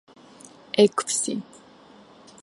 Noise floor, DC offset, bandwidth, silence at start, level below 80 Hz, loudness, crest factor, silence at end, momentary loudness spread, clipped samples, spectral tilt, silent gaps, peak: -51 dBFS; under 0.1%; 11.5 kHz; 0.75 s; -74 dBFS; -23 LUFS; 22 dB; 1 s; 10 LU; under 0.1%; -3.5 dB/octave; none; -4 dBFS